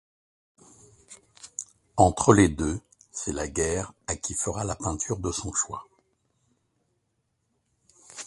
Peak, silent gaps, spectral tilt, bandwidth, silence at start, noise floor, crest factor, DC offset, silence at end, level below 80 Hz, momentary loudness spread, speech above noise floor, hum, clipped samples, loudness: 0 dBFS; none; -5 dB/octave; 11.5 kHz; 1.1 s; -75 dBFS; 28 dB; under 0.1%; 0 s; -44 dBFS; 19 LU; 50 dB; none; under 0.1%; -26 LUFS